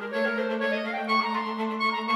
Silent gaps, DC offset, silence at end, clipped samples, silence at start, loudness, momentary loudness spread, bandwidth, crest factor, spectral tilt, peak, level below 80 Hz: none; under 0.1%; 0 s; under 0.1%; 0 s; -27 LUFS; 4 LU; 13.5 kHz; 14 dB; -5 dB/octave; -14 dBFS; -82 dBFS